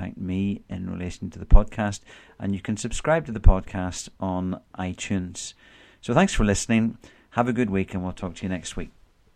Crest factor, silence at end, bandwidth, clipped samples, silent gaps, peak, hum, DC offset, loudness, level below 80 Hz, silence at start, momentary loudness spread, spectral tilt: 24 dB; 0.45 s; 10 kHz; under 0.1%; none; 0 dBFS; none; under 0.1%; -26 LUFS; -26 dBFS; 0 s; 13 LU; -5.5 dB/octave